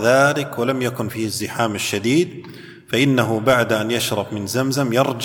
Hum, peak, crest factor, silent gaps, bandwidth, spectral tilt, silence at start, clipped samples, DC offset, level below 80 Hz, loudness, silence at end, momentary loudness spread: none; -2 dBFS; 18 dB; none; 19 kHz; -4.5 dB/octave; 0 s; under 0.1%; under 0.1%; -58 dBFS; -19 LUFS; 0 s; 8 LU